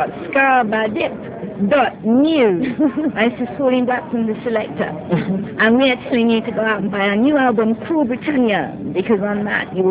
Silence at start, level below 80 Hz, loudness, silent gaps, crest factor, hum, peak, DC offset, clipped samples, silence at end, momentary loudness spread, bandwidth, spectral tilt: 0 s; -52 dBFS; -17 LUFS; none; 16 dB; none; -2 dBFS; under 0.1%; under 0.1%; 0 s; 8 LU; 4 kHz; -10 dB/octave